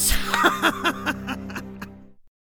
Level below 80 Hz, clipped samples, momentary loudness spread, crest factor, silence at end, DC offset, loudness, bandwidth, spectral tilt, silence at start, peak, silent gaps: -36 dBFS; under 0.1%; 19 LU; 22 dB; 0.2 s; under 0.1%; -22 LUFS; over 20 kHz; -2.5 dB/octave; 0 s; -4 dBFS; none